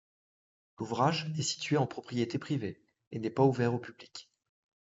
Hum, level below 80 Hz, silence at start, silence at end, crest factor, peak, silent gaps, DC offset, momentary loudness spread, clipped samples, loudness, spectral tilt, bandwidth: none; -76 dBFS; 0.8 s; 0.6 s; 20 dB; -12 dBFS; 3.07-3.11 s; under 0.1%; 17 LU; under 0.1%; -32 LUFS; -5.5 dB/octave; 8 kHz